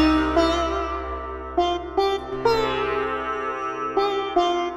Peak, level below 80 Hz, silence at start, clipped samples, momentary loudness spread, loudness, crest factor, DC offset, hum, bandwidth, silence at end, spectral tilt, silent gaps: -8 dBFS; -38 dBFS; 0 s; under 0.1%; 7 LU; -23 LUFS; 16 dB; under 0.1%; none; 13.5 kHz; 0 s; -5.5 dB/octave; none